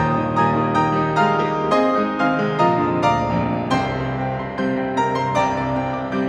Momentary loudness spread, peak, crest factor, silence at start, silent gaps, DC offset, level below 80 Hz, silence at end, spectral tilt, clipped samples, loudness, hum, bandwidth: 5 LU; -4 dBFS; 14 dB; 0 s; none; under 0.1%; -44 dBFS; 0 s; -7 dB/octave; under 0.1%; -19 LUFS; none; 11 kHz